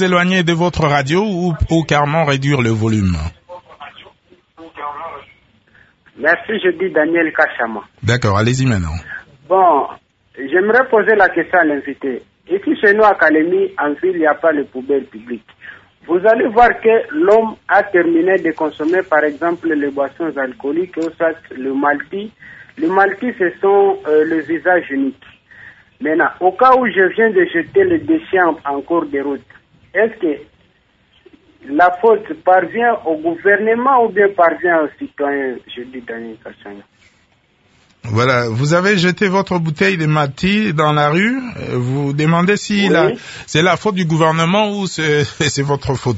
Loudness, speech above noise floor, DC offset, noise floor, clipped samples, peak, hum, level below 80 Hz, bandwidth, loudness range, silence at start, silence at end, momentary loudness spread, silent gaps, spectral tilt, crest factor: -15 LUFS; 41 dB; under 0.1%; -56 dBFS; under 0.1%; 0 dBFS; none; -40 dBFS; 8 kHz; 6 LU; 0 s; 0 s; 13 LU; none; -6 dB/octave; 16 dB